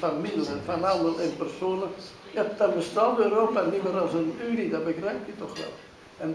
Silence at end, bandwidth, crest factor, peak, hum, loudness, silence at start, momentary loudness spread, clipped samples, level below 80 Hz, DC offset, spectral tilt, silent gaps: 0 s; 11 kHz; 18 dB; -10 dBFS; none; -27 LUFS; 0 s; 13 LU; under 0.1%; -64 dBFS; under 0.1%; -6 dB/octave; none